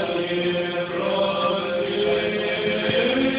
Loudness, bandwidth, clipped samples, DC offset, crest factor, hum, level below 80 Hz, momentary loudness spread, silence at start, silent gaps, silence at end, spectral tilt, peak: -22 LUFS; 4 kHz; under 0.1%; under 0.1%; 14 dB; none; -54 dBFS; 4 LU; 0 s; none; 0 s; -9 dB/octave; -10 dBFS